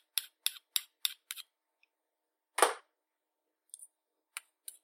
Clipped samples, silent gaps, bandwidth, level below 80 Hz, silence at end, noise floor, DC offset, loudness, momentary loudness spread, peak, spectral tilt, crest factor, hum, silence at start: under 0.1%; none; 16.5 kHz; under -90 dBFS; 0.45 s; -87 dBFS; under 0.1%; -35 LUFS; 21 LU; -8 dBFS; 3 dB/octave; 32 dB; none; 0.15 s